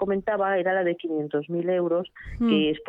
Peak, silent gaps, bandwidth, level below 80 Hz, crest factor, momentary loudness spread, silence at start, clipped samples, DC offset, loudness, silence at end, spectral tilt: -10 dBFS; none; 4.8 kHz; -50 dBFS; 16 dB; 6 LU; 0 s; under 0.1%; under 0.1%; -25 LUFS; 0 s; -8.5 dB/octave